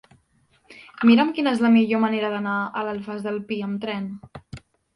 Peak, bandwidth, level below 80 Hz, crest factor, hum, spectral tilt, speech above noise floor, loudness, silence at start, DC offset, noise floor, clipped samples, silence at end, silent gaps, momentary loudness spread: -4 dBFS; 10.5 kHz; -60 dBFS; 18 dB; none; -7 dB/octave; 41 dB; -22 LUFS; 0.7 s; under 0.1%; -63 dBFS; under 0.1%; 0.35 s; none; 15 LU